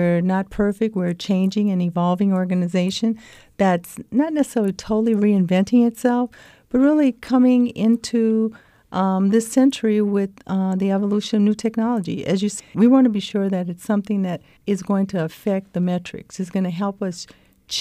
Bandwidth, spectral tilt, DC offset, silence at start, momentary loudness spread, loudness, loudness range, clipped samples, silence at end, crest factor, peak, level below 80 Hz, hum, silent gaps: 13.5 kHz; -6.5 dB/octave; under 0.1%; 0 s; 9 LU; -20 LUFS; 5 LU; under 0.1%; 0 s; 14 dB; -4 dBFS; -54 dBFS; none; none